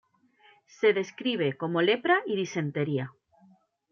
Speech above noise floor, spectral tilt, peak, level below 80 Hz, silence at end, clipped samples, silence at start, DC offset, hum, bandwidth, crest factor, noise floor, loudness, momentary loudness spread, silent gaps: 35 dB; -6 dB/octave; -12 dBFS; -78 dBFS; 0.8 s; under 0.1%; 0.8 s; under 0.1%; none; 7 kHz; 18 dB; -62 dBFS; -27 LUFS; 6 LU; none